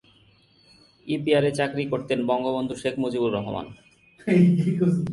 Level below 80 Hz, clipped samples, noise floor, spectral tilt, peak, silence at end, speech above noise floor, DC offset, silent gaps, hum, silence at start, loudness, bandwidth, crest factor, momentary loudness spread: -58 dBFS; under 0.1%; -58 dBFS; -7.5 dB/octave; -8 dBFS; 0 s; 35 dB; under 0.1%; none; none; 1.05 s; -24 LUFS; 11.5 kHz; 16 dB; 14 LU